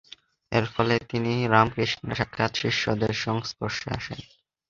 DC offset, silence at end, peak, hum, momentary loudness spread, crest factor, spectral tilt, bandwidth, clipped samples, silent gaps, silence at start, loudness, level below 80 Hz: under 0.1%; 0.45 s; -2 dBFS; none; 10 LU; 24 dB; -5.5 dB/octave; 7.6 kHz; under 0.1%; none; 0.5 s; -26 LUFS; -52 dBFS